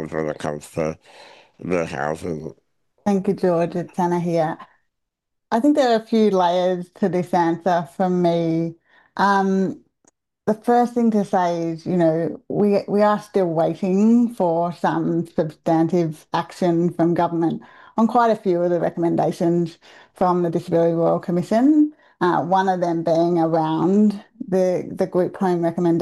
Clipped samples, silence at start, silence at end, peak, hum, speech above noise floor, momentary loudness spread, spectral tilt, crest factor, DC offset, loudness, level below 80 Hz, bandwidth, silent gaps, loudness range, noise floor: under 0.1%; 0 s; 0 s; -8 dBFS; none; 58 dB; 9 LU; -7.5 dB/octave; 12 dB; under 0.1%; -20 LUFS; -60 dBFS; 12.5 kHz; none; 4 LU; -78 dBFS